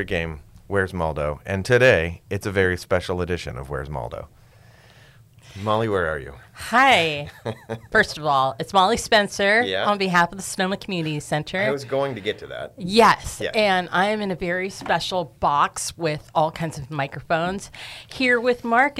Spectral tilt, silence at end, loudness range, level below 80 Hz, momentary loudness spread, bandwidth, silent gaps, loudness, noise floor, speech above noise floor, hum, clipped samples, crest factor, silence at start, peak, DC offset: -4.5 dB/octave; 0 s; 7 LU; -46 dBFS; 15 LU; 16 kHz; none; -22 LUFS; -50 dBFS; 28 dB; none; under 0.1%; 18 dB; 0 s; -6 dBFS; under 0.1%